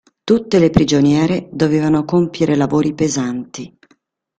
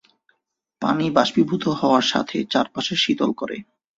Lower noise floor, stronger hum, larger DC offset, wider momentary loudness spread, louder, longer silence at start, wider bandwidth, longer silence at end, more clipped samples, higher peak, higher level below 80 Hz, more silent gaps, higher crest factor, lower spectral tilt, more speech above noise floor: second, -58 dBFS vs -75 dBFS; neither; neither; about the same, 11 LU vs 9 LU; first, -15 LUFS vs -21 LUFS; second, 0.25 s vs 0.8 s; first, 9 kHz vs 7.8 kHz; first, 0.7 s vs 0.35 s; neither; about the same, 0 dBFS vs -2 dBFS; first, -42 dBFS vs -62 dBFS; neither; about the same, 16 dB vs 20 dB; first, -6 dB/octave vs -4.5 dB/octave; second, 44 dB vs 54 dB